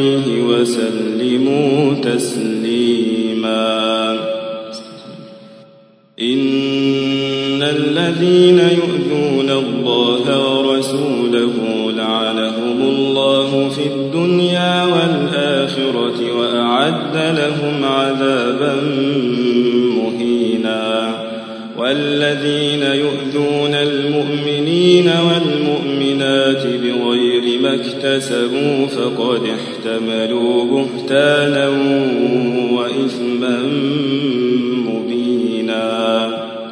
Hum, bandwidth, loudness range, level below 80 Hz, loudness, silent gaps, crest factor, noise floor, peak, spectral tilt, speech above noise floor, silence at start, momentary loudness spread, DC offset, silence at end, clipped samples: none; 11 kHz; 3 LU; -64 dBFS; -15 LUFS; none; 16 dB; -47 dBFS; 0 dBFS; -5.5 dB/octave; 32 dB; 0 s; 5 LU; under 0.1%; 0 s; under 0.1%